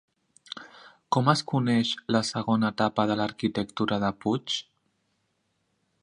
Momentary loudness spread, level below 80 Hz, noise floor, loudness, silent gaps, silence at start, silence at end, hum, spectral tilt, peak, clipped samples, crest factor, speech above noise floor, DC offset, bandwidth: 8 LU; -62 dBFS; -75 dBFS; -26 LUFS; none; 0.5 s; 1.4 s; none; -5.5 dB/octave; -4 dBFS; under 0.1%; 24 dB; 49 dB; under 0.1%; 11 kHz